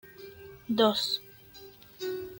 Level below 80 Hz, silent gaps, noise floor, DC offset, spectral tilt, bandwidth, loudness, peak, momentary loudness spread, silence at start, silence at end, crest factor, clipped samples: -66 dBFS; none; -51 dBFS; under 0.1%; -4 dB/octave; 17 kHz; -29 LUFS; -10 dBFS; 24 LU; 0.05 s; 0 s; 22 dB; under 0.1%